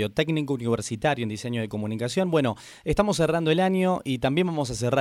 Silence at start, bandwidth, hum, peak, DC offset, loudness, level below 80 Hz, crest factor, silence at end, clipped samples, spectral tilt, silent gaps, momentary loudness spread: 0 s; 15 kHz; none; -8 dBFS; under 0.1%; -25 LUFS; -48 dBFS; 16 dB; 0 s; under 0.1%; -5.5 dB/octave; none; 7 LU